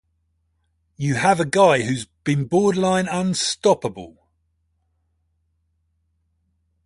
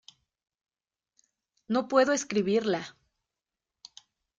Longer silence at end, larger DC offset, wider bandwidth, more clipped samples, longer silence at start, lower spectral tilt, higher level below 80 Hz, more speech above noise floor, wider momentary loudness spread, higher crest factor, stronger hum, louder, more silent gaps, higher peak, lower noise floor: first, 2.75 s vs 1.5 s; neither; first, 11.5 kHz vs 9.4 kHz; neither; second, 1 s vs 1.7 s; about the same, -5 dB/octave vs -4 dB/octave; first, -56 dBFS vs -74 dBFS; second, 50 dB vs 63 dB; about the same, 10 LU vs 9 LU; about the same, 20 dB vs 22 dB; neither; first, -20 LUFS vs -27 LUFS; neither; first, -2 dBFS vs -10 dBFS; second, -69 dBFS vs -89 dBFS